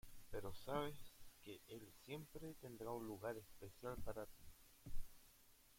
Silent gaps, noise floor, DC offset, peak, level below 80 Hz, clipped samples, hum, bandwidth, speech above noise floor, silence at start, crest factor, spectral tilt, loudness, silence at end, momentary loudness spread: none; -70 dBFS; under 0.1%; -32 dBFS; -60 dBFS; under 0.1%; none; 16.5 kHz; 19 dB; 0.05 s; 18 dB; -5.5 dB/octave; -53 LUFS; 0 s; 17 LU